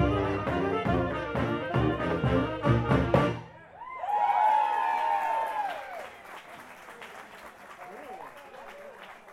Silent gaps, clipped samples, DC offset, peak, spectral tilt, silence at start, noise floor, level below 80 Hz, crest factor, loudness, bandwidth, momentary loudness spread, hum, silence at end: none; under 0.1%; under 0.1%; -8 dBFS; -7.5 dB/octave; 0 s; -47 dBFS; -44 dBFS; 20 dB; -28 LUFS; 14.5 kHz; 21 LU; none; 0 s